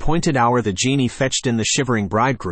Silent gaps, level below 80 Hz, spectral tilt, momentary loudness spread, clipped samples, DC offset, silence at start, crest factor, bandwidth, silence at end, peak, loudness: none; -36 dBFS; -4.5 dB/octave; 2 LU; under 0.1%; under 0.1%; 0 s; 12 dB; 8.8 kHz; 0 s; -6 dBFS; -18 LUFS